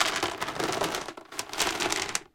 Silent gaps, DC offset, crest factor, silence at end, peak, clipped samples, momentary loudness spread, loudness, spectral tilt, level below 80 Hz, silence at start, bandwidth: none; under 0.1%; 24 dB; 0.1 s; -6 dBFS; under 0.1%; 9 LU; -29 LUFS; -1.5 dB/octave; -58 dBFS; 0 s; 17 kHz